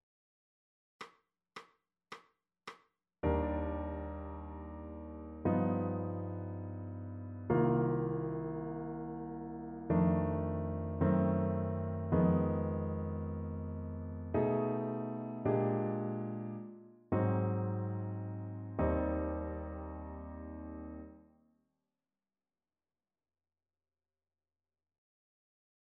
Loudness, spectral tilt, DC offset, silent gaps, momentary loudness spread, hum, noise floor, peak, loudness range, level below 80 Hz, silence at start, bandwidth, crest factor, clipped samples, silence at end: -36 LUFS; -9.5 dB/octave; under 0.1%; none; 18 LU; none; under -90 dBFS; -18 dBFS; 10 LU; -52 dBFS; 1 s; 5.6 kHz; 18 dB; under 0.1%; 4.7 s